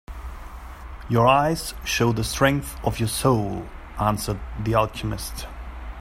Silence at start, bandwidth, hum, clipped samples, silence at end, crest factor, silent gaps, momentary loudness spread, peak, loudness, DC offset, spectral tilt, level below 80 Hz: 0.1 s; 16 kHz; none; under 0.1%; 0 s; 20 dB; none; 19 LU; -2 dBFS; -23 LUFS; under 0.1%; -5 dB/octave; -36 dBFS